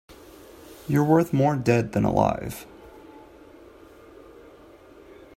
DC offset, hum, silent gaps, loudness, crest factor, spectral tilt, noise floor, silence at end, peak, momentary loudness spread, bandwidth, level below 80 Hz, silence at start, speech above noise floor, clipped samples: under 0.1%; none; none; -23 LUFS; 22 dB; -7.5 dB/octave; -49 dBFS; 2.4 s; -4 dBFS; 26 LU; 16 kHz; -52 dBFS; 0.7 s; 28 dB; under 0.1%